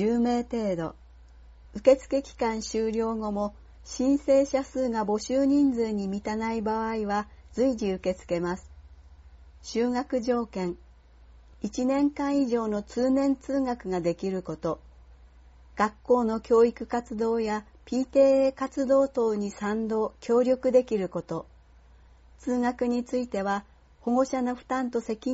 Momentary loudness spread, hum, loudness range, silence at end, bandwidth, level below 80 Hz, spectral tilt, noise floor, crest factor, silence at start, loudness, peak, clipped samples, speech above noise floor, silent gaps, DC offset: 11 LU; none; 6 LU; 0 s; 8 kHz; -52 dBFS; -5.5 dB/octave; -54 dBFS; 20 dB; 0 s; -27 LUFS; -8 dBFS; under 0.1%; 28 dB; none; under 0.1%